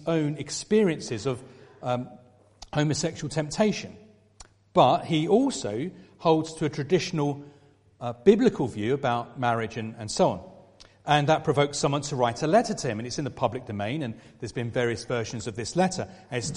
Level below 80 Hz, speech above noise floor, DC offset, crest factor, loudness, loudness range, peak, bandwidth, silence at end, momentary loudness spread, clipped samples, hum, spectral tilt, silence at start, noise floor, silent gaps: -58 dBFS; 28 dB; under 0.1%; 22 dB; -26 LUFS; 4 LU; -4 dBFS; 11.5 kHz; 0 s; 13 LU; under 0.1%; none; -5.5 dB/octave; 0 s; -53 dBFS; none